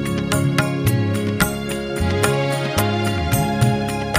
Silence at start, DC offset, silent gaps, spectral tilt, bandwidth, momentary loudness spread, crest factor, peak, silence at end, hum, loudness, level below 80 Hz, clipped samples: 0 s; under 0.1%; none; -5.5 dB/octave; 15.5 kHz; 3 LU; 18 dB; -2 dBFS; 0 s; none; -20 LUFS; -36 dBFS; under 0.1%